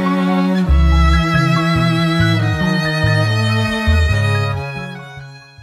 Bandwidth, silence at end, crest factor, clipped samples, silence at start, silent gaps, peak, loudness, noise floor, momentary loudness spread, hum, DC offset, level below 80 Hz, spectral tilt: 14 kHz; 0.25 s; 12 dB; under 0.1%; 0 s; none; -2 dBFS; -15 LUFS; -35 dBFS; 12 LU; none; under 0.1%; -20 dBFS; -6.5 dB/octave